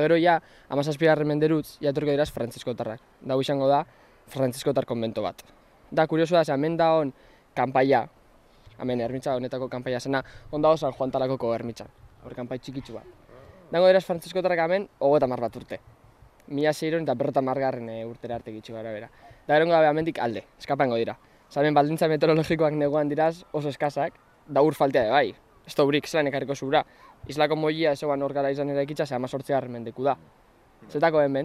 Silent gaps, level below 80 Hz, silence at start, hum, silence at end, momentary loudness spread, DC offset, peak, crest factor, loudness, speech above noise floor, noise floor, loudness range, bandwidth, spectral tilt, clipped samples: none; -58 dBFS; 0 s; none; 0 s; 14 LU; under 0.1%; -6 dBFS; 18 dB; -25 LUFS; 31 dB; -56 dBFS; 4 LU; 15 kHz; -6.5 dB/octave; under 0.1%